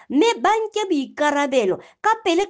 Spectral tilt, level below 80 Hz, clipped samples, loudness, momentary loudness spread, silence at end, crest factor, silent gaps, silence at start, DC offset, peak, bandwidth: -3 dB/octave; -64 dBFS; under 0.1%; -20 LUFS; 5 LU; 0 s; 14 dB; none; 0.1 s; under 0.1%; -6 dBFS; 10 kHz